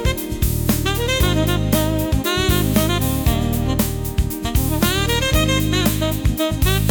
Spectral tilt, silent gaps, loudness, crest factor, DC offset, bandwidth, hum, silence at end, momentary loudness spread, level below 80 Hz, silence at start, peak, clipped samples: -5 dB/octave; none; -19 LUFS; 14 dB; under 0.1%; 19.5 kHz; none; 0 s; 4 LU; -24 dBFS; 0 s; -4 dBFS; under 0.1%